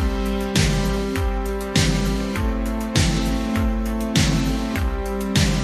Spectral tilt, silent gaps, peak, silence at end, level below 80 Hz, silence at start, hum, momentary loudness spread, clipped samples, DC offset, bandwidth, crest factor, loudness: -5 dB/octave; none; -4 dBFS; 0 s; -26 dBFS; 0 s; none; 5 LU; under 0.1%; under 0.1%; 14 kHz; 16 dB; -22 LUFS